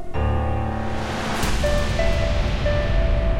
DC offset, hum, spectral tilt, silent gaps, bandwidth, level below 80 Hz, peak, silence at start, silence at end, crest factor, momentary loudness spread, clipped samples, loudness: under 0.1%; none; -5.5 dB/octave; none; 16 kHz; -24 dBFS; -8 dBFS; 0 s; 0 s; 12 dB; 4 LU; under 0.1%; -23 LUFS